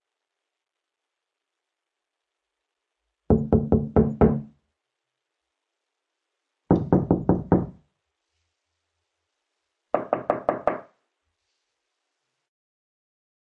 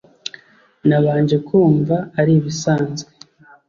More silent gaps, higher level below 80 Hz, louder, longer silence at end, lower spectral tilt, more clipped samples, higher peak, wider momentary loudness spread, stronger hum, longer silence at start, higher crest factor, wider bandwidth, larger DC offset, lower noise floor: neither; first, -44 dBFS vs -56 dBFS; second, -23 LUFS vs -17 LUFS; first, 2.65 s vs 0.65 s; first, -12 dB/octave vs -7 dB/octave; neither; about the same, -6 dBFS vs -4 dBFS; second, 9 LU vs 16 LU; neither; first, 3.3 s vs 0.85 s; first, 22 dB vs 14 dB; second, 4 kHz vs 7.4 kHz; neither; first, -85 dBFS vs -46 dBFS